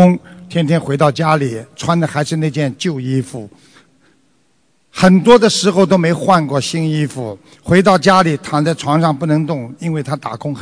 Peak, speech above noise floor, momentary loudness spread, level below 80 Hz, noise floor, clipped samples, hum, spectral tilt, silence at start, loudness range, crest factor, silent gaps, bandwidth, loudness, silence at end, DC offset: 0 dBFS; 46 dB; 12 LU; -48 dBFS; -60 dBFS; 0.5%; none; -6 dB/octave; 0 s; 7 LU; 14 dB; none; 11 kHz; -14 LUFS; 0 s; under 0.1%